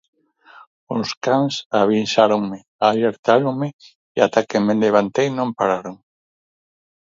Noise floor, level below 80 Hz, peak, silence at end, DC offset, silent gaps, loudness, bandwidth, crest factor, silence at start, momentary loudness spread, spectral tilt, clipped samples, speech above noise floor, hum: -48 dBFS; -64 dBFS; 0 dBFS; 1.05 s; under 0.1%; 1.17-1.21 s, 1.66-1.70 s, 2.68-2.79 s, 3.19-3.23 s, 3.73-3.79 s, 3.95-4.15 s; -19 LUFS; 7.6 kHz; 20 dB; 0.9 s; 10 LU; -5.5 dB/octave; under 0.1%; 30 dB; none